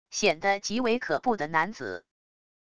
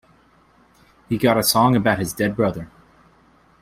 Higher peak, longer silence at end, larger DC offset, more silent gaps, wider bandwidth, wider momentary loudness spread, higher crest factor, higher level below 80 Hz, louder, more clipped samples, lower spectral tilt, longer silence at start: second, -10 dBFS vs -2 dBFS; second, 0.65 s vs 0.95 s; neither; neither; second, 11 kHz vs 16 kHz; about the same, 13 LU vs 13 LU; about the same, 20 dB vs 20 dB; second, -62 dBFS vs -50 dBFS; second, -27 LUFS vs -19 LUFS; neither; second, -3 dB/octave vs -4.5 dB/octave; second, 0.05 s vs 1.1 s